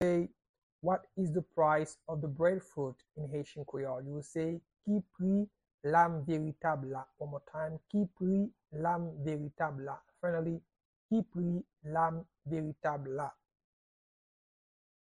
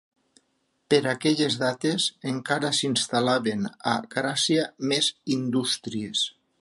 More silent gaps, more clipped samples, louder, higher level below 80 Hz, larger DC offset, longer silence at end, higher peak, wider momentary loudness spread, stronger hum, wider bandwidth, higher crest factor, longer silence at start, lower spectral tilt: first, 0.49-0.79 s, 5.74-5.78 s, 10.85-11.09 s vs none; neither; second, -36 LUFS vs -25 LUFS; about the same, -68 dBFS vs -70 dBFS; neither; first, 1.75 s vs 0.3 s; second, -14 dBFS vs -8 dBFS; first, 11 LU vs 5 LU; neither; about the same, 10.5 kHz vs 11.5 kHz; about the same, 22 dB vs 18 dB; second, 0 s vs 0.9 s; first, -8 dB/octave vs -3.5 dB/octave